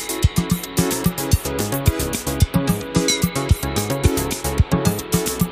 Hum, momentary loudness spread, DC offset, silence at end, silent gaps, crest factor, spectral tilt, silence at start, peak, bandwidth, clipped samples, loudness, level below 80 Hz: none; 3 LU; under 0.1%; 0 s; none; 18 dB; -4.5 dB/octave; 0 s; -2 dBFS; 15.5 kHz; under 0.1%; -20 LUFS; -28 dBFS